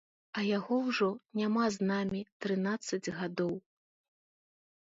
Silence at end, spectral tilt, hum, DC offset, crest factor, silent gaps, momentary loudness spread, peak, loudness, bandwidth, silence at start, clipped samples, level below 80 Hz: 1.25 s; -5.5 dB/octave; none; under 0.1%; 16 dB; 2.32-2.40 s; 7 LU; -18 dBFS; -33 LUFS; 8 kHz; 0.35 s; under 0.1%; -72 dBFS